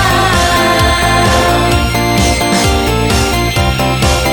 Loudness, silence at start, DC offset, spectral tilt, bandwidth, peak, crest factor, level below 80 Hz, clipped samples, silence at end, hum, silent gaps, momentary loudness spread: -11 LUFS; 0 s; under 0.1%; -4 dB/octave; 20 kHz; 0 dBFS; 10 dB; -20 dBFS; under 0.1%; 0 s; none; none; 3 LU